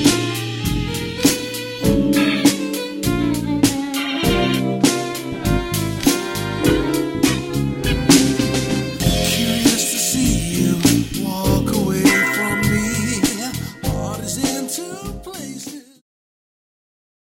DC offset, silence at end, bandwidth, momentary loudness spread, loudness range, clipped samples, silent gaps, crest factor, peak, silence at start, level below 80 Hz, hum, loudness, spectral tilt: under 0.1%; 1.6 s; 16.5 kHz; 9 LU; 6 LU; under 0.1%; none; 18 dB; -2 dBFS; 0 s; -34 dBFS; none; -18 LUFS; -4 dB/octave